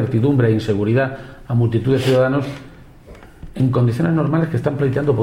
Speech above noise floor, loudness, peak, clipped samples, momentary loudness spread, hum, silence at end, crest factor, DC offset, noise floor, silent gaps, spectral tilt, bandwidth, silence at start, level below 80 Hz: 24 dB; -18 LUFS; -4 dBFS; under 0.1%; 8 LU; none; 0 s; 14 dB; under 0.1%; -41 dBFS; none; -8.5 dB/octave; 12 kHz; 0 s; -44 dBFS